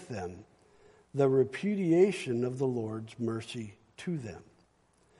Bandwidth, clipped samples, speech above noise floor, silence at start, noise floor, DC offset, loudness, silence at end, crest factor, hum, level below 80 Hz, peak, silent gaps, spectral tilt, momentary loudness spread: 11.5 kHz; under 0.1%; 37 dB; 0 s; -68 dBFS; under 0.1%; -31 LUFS; 0.8 s; 18 dB; none; -70 dBFS; -14 dBFS; none; -7 dB/octave; 18 LU